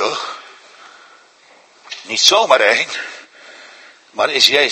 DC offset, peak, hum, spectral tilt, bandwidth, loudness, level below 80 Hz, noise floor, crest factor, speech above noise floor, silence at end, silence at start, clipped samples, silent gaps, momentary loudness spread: under 0.1%; 0 dBFS; none; 0.5 dB/octave; 16 kHz; -13 LUFS; -68 dBFS; -49 dBFS; 18 dB; 35 dB; 0 s; 0 s; under 0.1%; none; 22 LU